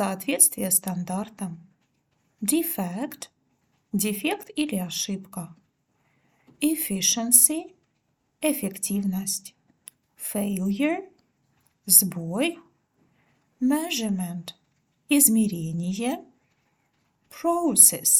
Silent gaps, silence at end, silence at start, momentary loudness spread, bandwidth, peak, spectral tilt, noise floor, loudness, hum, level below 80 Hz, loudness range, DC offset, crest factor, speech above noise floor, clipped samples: none; 0 s; 0 s; 18 LU; 19 kHz; 0 dBFS; -3 dB/octave; -72 dBFS; -22 LUFS; none; -68 dBFS; 7 LU; under 0.1%; 26 dB; 49 dB; under 0.1%